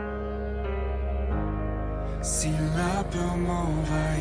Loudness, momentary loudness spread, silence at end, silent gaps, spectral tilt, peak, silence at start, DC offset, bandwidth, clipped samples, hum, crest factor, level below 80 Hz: -29 LUFS; 6 LU; 0 s; none; -5.5 dB/octave; -14 dBFS; 0 s; under 0.1%; 10.5 kHz; under 0.1%; none; 14 dB; -32 dBFS